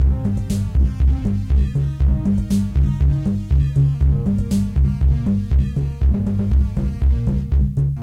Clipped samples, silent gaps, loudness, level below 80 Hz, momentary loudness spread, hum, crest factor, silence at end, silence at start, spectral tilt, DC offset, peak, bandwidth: under 0.1%; none; -19 LUFS; -20 dBFS; 3 LU; none; 10 dB; 0 s; 0 s; -9 dB/octave; under 0.1%; -6 dBFS; 10 kHz